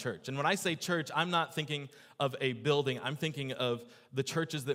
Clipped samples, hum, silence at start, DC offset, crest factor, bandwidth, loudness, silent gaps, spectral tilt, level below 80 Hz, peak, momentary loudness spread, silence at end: under 0.1%; none; 0 s; under 0.1%; 20 dB; 16 kHz; -34 LUFS; none; -4.5 dB/octave; -78 dBFS; -14 dBFS; 7 LU; 0 s